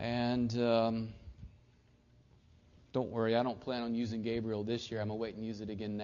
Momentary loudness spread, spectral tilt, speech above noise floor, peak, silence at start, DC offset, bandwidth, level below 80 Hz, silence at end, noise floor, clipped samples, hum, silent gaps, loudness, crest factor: 11 LU; -5.5 dB/octave; 31 dB; -16 dBFS; 0 s; under 0.1%; 7.2 kHz; -62 dBFS; 0 s; -66 dBFS; under 0.1%; none; none; -35 LUFS; 20 dB